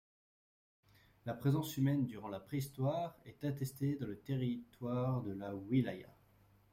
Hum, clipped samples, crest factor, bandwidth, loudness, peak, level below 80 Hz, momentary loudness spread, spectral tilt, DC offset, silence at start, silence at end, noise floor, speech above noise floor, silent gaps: none; under 0.1%; 18 dB; 16 kHz; -39 LUFS; -22 dBFS; -70 dBFS; 10 LU; -7.5 dB/octave; under 0.1%; 1.25 s; 0.65 s; -68 dBFS; 30 dB; none